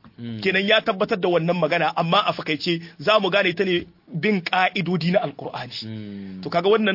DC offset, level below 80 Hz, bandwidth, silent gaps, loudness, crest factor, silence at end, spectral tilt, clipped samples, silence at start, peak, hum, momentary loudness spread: under 0.1%; -64 dBFS; 5.8 kHz; none; -21 LUFS; 18 dB; 0 s; -6.5 dB/octave; under 0.1%; 0.05 s; -2 dBFS; none; 14 LU